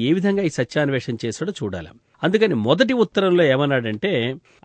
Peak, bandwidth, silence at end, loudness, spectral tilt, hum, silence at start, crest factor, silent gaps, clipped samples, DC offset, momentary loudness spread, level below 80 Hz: -2 dBFS; 9.4 kHz; 0.25 s; -20 LUFS; -6 dB/octave; none; 0 s; 18 dB; none; under 0.1%; under 0.1%; 10 LU; -58 dBFS